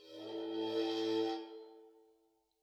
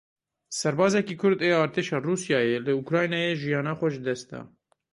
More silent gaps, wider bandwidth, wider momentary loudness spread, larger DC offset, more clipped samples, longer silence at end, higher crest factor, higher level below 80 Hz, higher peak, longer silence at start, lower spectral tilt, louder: neither; about the same, 12.5 kHz vs 11.5 kHz; first, 17 LU vs 9 LU; neither; neither; first, 0.7 s vs 0.45 s; about the same, 16 dB vs 18 dB; second, under -90 dBFS vs -68 dBFS; second, -24 dBFS vs -8 dBFS; second, 0 s vs 0.5 s; about the same, -4.5 dB/octave vs -5 dB/octave; second, -38 LUFS vs -25 LUFS